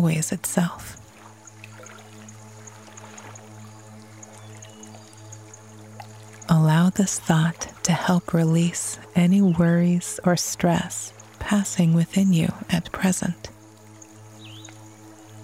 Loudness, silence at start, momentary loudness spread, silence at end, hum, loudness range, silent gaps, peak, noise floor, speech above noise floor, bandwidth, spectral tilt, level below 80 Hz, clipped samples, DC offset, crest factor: -22 LUFS; 0 s; 24 LU; 0 s; none; 22 LU; none; -4 dBFS; -47 dBFS; 25 dB; 16 kHz; -5.5 dB/octave; -54 dBFS; under 0.1%; under 0.1%; 20 dB